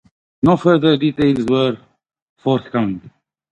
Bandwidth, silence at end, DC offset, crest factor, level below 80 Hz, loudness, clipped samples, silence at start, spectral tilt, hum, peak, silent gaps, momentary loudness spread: 8.8 kHz; 0.4 s; under 0.1%; 18 dB; -50 dBFS; -17 LUFS; under 0.1%; 0.45 s; -8 dB/octave; none; 0 dBFS; 2.22-2.36 s; 11 LU